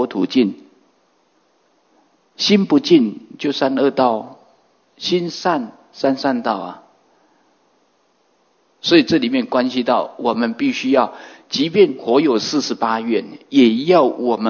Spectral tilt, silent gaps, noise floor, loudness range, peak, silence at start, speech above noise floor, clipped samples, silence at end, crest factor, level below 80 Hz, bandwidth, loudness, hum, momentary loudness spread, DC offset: -5 dB/octave; none; -61 dBFS; 6 LU; 0 dBFS; 0 s; 44 dB; under 0.1%; 0 s; 18 dB; -68 dBFS; 7 kHz; -17 LUFS; none; 10 LU; under 0.1%